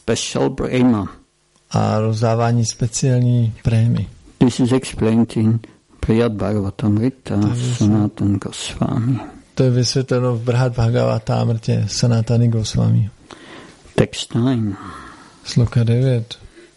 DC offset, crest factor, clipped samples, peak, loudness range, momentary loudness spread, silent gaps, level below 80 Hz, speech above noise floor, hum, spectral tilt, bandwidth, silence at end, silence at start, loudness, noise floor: under 0.1%; 16 dB; under 0.1%; -2 dBFS; 3 LU; 9 LU; none; -40 dBFS; 40 dB; none; -6.5 dB/octave; 11.5 kHz; 0.15 s; 0.05 s; -18 LUFS; -57 dBFS